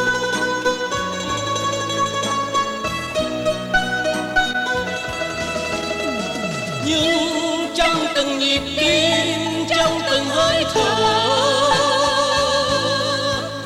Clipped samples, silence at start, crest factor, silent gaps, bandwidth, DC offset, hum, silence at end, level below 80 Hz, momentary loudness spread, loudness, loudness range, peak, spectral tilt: under 0.1%; 0 s; 16 dB; none; 16 kHz; under 0.1%; none; 0 s; -44 dBFS; 7 LU; -19 LUFS; 4 LU; -4 dBFS; -3 dB/octave